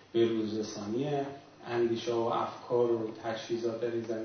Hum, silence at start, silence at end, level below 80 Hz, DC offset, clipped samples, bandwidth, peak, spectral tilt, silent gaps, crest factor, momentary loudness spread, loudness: none; 0 s; 0 s; -74 dBFS; under 0.1%; under 0.1%; 6.6 kHz; -16 dBFS; -6 dB/octave; none; 16 dB; 7 LU; -33 LUFS